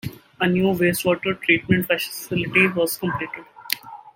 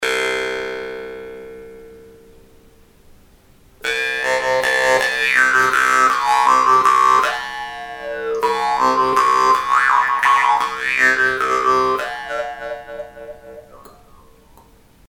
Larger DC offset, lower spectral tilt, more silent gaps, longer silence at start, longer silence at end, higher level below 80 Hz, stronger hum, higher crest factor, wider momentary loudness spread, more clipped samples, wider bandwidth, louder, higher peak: neither; first, -5 dB/octave vs -1.5 dB/octave; neither; about the same, 0.05 s vs 0 s; second, 0.05 s vs 1.25 s; about the same, -54 dBFS vs -52 dBFS; neither; first, 22 dB vs 16 dB; second, 10 LU vs 18 LU; neither; about the same, 17 kHz vs 17.5 kHz; second, -21 LUFS vs -16 LUFS; about the same, 0 dBFS vs -2 dBFS